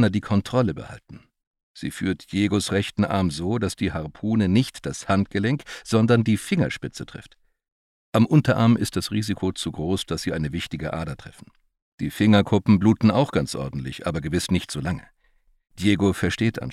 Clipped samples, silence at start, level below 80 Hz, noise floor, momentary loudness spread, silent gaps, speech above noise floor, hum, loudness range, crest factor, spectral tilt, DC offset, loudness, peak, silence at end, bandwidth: under 0.1%; 0 s; -48 dBFS; -62 dBFS; 13 LU; 1.47-1.54 s, 1.63-1.75 s, 7.72-8.13 s, 11.82-11.98 s; 40 dB; none; 4 LU; 18 dB; -6 dB/octave; under 0.1%; -23 LUFS; -4 dBFS; 0 s; 14 kHz